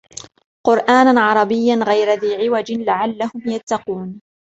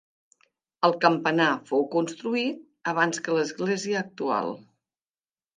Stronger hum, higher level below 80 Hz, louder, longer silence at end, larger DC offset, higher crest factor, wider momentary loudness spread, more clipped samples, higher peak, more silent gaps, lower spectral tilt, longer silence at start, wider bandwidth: neither; first, -60 dBFS vs -80 dBFS; first, -16 LUFS vs -26 LUFS; second, 0.3 s vs 0.95 s; neither; second, 16 dB vs 22 dB; first, 15 LU vs 8 LU; neither; about the same, -2 dBFS vs -4 dBFS; first, 3.63-3.67 s vs none; about the same, -5 dB/octave vs -4.5 dB/octave; second, 0.65 s vs 0.8 s; second, 8.2 kHz vs 9.8 kHz